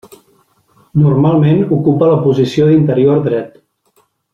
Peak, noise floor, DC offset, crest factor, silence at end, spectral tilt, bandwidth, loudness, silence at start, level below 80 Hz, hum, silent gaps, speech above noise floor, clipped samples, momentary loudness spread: -2 dBFS; -57 dBFS; under 0.1%; 10 dB; 0.85 s; -9.5 dB/octave; 7.2 kHz; -12 LUFS; 0.95 s; -50 dBFS; none; none; 47 dB; under 0.1%; 8 LU